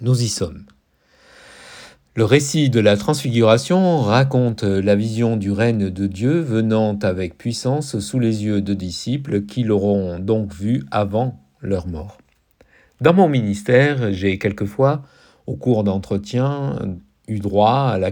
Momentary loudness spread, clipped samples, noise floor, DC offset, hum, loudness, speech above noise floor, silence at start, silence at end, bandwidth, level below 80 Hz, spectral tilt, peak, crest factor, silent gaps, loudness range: 11 LU; under 0.1%; -56 dBFS; under 0.1%; none; -19 LUFS; 39 dB; 0 s; 0 s; 18 kHz; -48 dBFS; -6.5 dB/octave; 0 dBFS; 18 dB; none; 5 LU